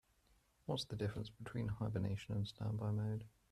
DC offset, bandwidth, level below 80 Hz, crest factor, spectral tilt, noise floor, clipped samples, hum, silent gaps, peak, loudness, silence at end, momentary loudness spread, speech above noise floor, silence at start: under 0.1%; 12 kHz; -64 dBFS; 16 dB; -7 dB/octave; -75 dBFS; under 0.1%; none; none; -26 dBFS; -43 LUFS; 0.25 s; 7 LU; 33 dB; 0.7 s